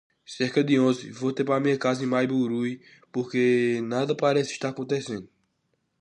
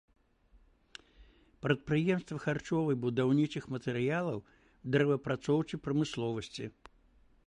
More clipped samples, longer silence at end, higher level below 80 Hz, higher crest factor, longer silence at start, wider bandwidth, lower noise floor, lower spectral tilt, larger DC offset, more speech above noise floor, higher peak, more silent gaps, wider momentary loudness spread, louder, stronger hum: neither; about the same, 0.75 s vs 0.8 s; second, -72 dBFS vs -64 dBFS; second, 16 dB vs 22 dB; second, 0.3 s vs 1.2 s; about the same, 10 kHz vs 10.5 kHz; first, -74 dBFS vs -65 dBFS; about the same, -6 dB/octave vs -7 dB/octave; neither; first, 49 dB vs 33 dB; about the same, -10 dBFS vs -12 dBFS; neither; second, 11 LU vs 15 LU; first, -25 LUFS vs -33 LUFS; neither